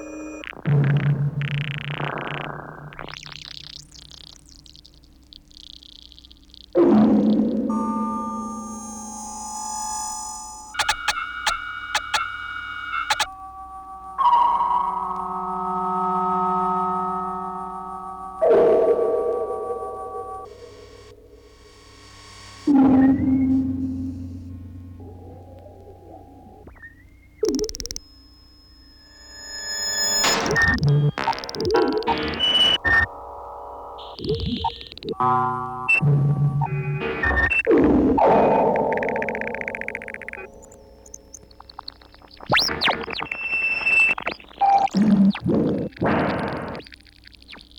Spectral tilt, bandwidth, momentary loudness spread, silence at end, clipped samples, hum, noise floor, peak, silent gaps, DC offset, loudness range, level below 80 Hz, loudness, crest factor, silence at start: -4.5 dB/octave; 18.5 kHz; 22 LU; 0.2 s; under 0.1%; none; -50 dBFS; -8 dBFS; none; under 0.1%; 13 LU; -44 dBFS; -21 LUFS; 16 dB; 0 s